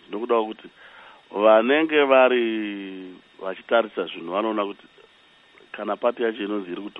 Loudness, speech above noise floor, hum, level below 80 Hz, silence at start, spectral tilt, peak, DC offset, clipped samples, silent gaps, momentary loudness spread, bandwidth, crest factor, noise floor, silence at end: -22 LUFS; 33 dB; none; -74 dBFS; 0.1 s; -7 dB/octave; -4 dBFS; under 0.1%; under 0.1%; none; 19 LU; 4.1 kHz; 20 dB; -55 dBFS; 0 s